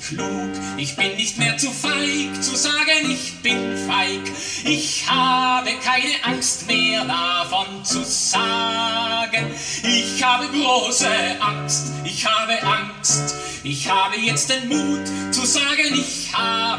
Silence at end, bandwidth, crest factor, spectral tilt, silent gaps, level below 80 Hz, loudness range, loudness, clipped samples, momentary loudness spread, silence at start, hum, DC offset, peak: 0 s; 11 kHz; 16 dB; -2 dB/octave; none; -56 dBFS; 1 LU; -19 LUFS; under 0.1%; 7 LU; 0 s; none; under 0.1%; -4 dBFS